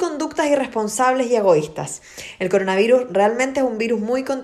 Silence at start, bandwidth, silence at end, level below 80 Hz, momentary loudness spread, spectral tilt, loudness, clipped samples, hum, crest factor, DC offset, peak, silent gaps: 0 s; 14 kHz; 0 s; -58 dBFS; 12 LU; -4.5 dB/octave; -19 LUFS; under 0.1%; none; 16 dB; under 0.1%; -4 dBFS; none